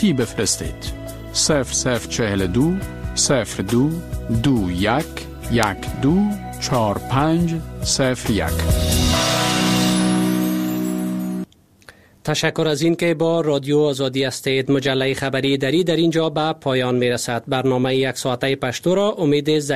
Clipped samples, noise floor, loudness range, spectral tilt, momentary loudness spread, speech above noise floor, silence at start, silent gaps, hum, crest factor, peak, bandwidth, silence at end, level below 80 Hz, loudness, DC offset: under 0.1%; -48 dBFS; 2 LU; -4.5 dB/octave; 6 LU; 29 dB; 0 s; none; none; 20 dB; 0 dBFS; 15 kHz; 0 s; -34 dBFS; -19 LUFS; 0.2%